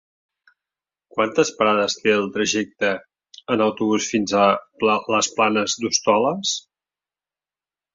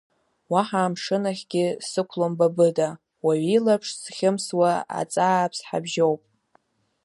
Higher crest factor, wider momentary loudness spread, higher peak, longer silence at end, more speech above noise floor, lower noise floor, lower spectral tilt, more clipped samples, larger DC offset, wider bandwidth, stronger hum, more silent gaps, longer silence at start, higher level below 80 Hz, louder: about the same, 18 dB vs 18 dB; about the same, 6 LU vs 7 LU; about the same, -4 dBFS vs -6 dBFS; first, 1.35 s vs 0.85 s; first, over 70 dB vs 42 dB; first, under -90 dBFS vs -65 dBFS; second, -3 dB/octave vs -5 dB/octave; neither; neither; second, 7.8 kHz vs 11.5 kHz; neither; neither; first, 1.15 s vs 0.5 s; first, -64 dBFS vs -74 dBFS; first, -20 LUFS vs -24 LUFS